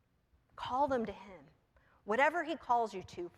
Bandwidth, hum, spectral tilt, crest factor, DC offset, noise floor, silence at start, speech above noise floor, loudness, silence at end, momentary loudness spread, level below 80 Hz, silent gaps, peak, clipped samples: 13 kHz; none; -5 dB/octave; 22 dB; under 0.1%; -73 dBFS; 0.6 s; 38 dB; -34 LUFS; 0.1 s; 20 LU; -68 dBFS; none; -16 dBFS; under 0.1%